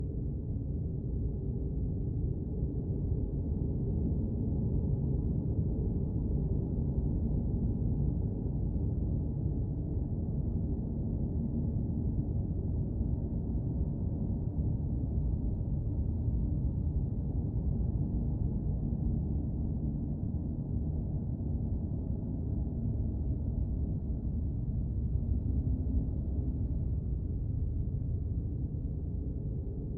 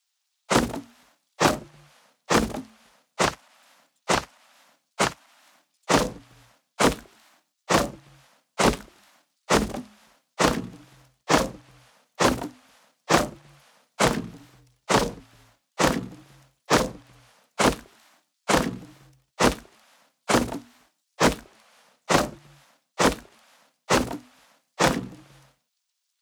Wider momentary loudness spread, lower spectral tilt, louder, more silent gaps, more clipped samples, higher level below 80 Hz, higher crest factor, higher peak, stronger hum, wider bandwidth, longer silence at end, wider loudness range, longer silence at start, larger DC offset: second, 3 LU vs 19 LU; first, -16 dB/octave vs -3.5 dB/octave; second, -34 LUFS vs -25 LUFS; neither; neither; first, -36 dBFS vs -46 dBFS; second, 14 dB vs 26 dB; second, -20 dBFS vs -2 dBFS; neither; second, 1.3 kHz vs over 20 kHz; second, 0 s vs 1.05 s; about the same, 2 LU vs 2 LU; second, 0 s vs 0.5 s; neither